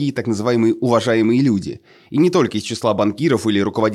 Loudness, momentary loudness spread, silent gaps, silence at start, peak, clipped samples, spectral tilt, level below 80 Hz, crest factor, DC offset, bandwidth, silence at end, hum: -17 LUFS; 6 LU; none; 0 s; -2 dBFS; under 0.1%; -6 dB/octave; -58 dBFS; 14 dB; under 0.1%; 12.5 kHz; 0 s; none